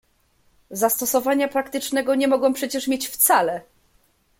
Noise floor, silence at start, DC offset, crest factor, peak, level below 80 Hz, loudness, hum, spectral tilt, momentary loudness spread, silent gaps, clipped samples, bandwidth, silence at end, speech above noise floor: -62 dBFS; 0.7 s; under 0.1%; 18 dB; -4 dBFS; -64 dBFS; -21 LUFS; none; -2 dB/octave; 8 LU; none; under 0.1%; 17 kHz; 0.8 s; 41 dB